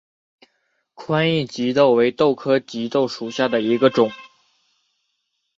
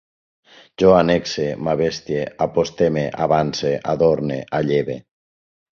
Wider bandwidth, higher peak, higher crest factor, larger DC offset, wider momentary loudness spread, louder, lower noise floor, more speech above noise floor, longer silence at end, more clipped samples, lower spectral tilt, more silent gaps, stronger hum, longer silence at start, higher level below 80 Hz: about the same, 7.8 kHz vs 7.2 kHz; about the same, -2 dBFS vs -2 dBFS; about the same, 18 dB vs 18 dB; neither; about the same, 8 LU vs 9 LU; about the same, -19 LUFS vs -19 LUFS; second, -73 dBFS vs under -90 dBFS; second, 55 dB vs over 71 dB; first, 1.3 s vs 0.8 s; neither; about the same, -6 dB/octave vs -6 dB/octave; neither; neither; first, 1 s vs 0.8 s; second, -64 dBFS vs -48 dBFS